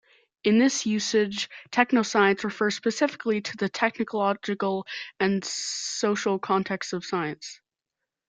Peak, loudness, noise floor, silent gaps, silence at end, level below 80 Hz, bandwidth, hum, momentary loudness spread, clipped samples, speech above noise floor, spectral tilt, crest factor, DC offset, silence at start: -4 dBFS; -26 LUFS; -86 dBFS; none; 0.75 s; -70 dBFS; 9.4 kHz; none; 8 LU; under 0.1%; 61 dB; -4 dB/octave; 22 dB; under 0.1%; 0.45 s